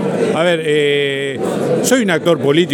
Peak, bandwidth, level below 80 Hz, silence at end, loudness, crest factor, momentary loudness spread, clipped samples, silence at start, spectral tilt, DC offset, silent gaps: 0 dBFS; 17.5 kHz; -62 dBFS; 0 s; -15 LUFS; 14 dB; 5 LU; under 0.1%; 0 s; -4.5 dB/octave; under 0.1%; none